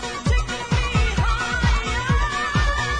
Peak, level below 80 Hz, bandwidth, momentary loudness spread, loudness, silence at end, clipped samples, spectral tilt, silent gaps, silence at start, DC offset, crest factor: -8 dBFS; -24 dBFS; 10.5 kHz; 2 LU; -22 LUFS; 0 s; under 0.1%; -4.5 dB/octave; none; 0 s; under 0.1%; 12 dB